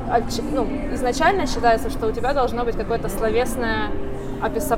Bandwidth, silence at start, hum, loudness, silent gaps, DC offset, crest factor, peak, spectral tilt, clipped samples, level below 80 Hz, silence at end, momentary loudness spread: 17 kHz; 0 s; none; -22 LUFS; none; under 0.1%; 14 dB; -6 dBFS; -5 dB/octave; under 0.1%; -30 dBFS; 0 s; 6 LU